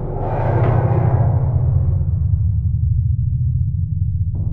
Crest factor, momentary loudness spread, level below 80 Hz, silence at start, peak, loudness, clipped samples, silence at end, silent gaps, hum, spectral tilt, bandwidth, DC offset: 12 dB; 5 LU; -24 dBFS; 0 s; -4 dBFS; -18 LUFS; under 0.1%; 0 s; none; none; -12.5 dB/octave; 3 kHz; 0.4%